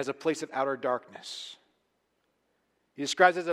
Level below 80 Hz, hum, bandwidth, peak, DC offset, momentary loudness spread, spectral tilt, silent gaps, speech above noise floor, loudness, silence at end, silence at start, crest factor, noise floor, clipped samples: -82 dBFS; none; 13.5 kHz; -6 dBFS; under 0.1%; 17 LU; -3 dB/octave; none; 47 dB; -29 LUFS; 0 s; 0 s; 24 dB; -76 dBFS; under 0.1%